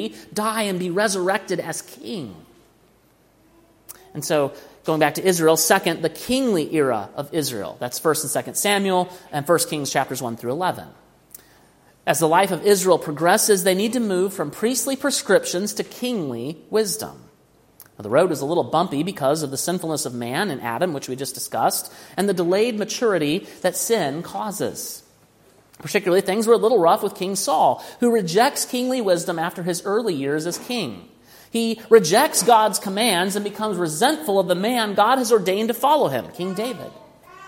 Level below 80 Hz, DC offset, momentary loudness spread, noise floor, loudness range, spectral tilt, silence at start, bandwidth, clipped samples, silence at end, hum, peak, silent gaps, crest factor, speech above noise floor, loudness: -64 dBFS; under 0.1%; 12 LU; -57 dBFS; 5 LU; -3.5 dB/octave; 0 s; 16.5 kHz; under 0.1%; 0 s; none; 0 dBFS; none; 20 dB; 37 dB; -21 LUFS